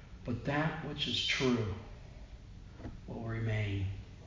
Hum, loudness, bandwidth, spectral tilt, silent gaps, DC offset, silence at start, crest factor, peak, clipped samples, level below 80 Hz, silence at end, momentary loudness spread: none; -35 LUFS; 7.6 kHz; -5 dB/octave; none; under 0.1%; 0 s; 18 dB; -18 dBFS; under 0.1%; -50 dBFS; 0 s; 22 LU